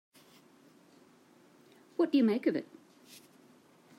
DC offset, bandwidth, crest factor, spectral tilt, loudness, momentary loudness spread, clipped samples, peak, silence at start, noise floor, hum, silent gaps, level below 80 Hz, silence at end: under 0.1%; 14 kHz; 18 dB; -6.5 dB/octave; -31 LUFS; 27 LU; under 0.1%; -18 dBFS; 2 s; -62 dBFS; none; none; under -90 dBFS; 1.35 s